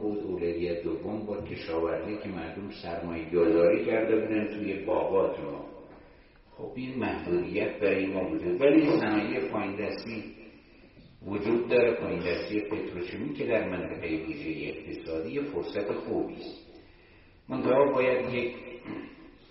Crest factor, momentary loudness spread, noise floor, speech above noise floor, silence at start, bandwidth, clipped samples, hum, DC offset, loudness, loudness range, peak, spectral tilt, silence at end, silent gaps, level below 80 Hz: 20 dB; 15 LU; -56 dBFS; 28 dB; 0 s; 5.8 kHz; under 0.1%; none; under 0.1%; -29 LUFS; 6 LU; -10 dBFS; -5 dB/octave; 0.2 s; none; -58 dBFS